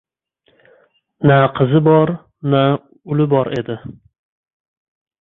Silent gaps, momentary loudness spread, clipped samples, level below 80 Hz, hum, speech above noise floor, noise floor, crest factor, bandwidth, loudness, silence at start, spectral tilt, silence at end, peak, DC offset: none; 13 LU; under 0.1%; -54 dBFS; none; 47 dB; -62 dBFS; 16 dB; 4.1 kHz; -15 LUFS; 1.2 s; -10 dB/octave; 1.3 s; -2 dBFS; under 0.1%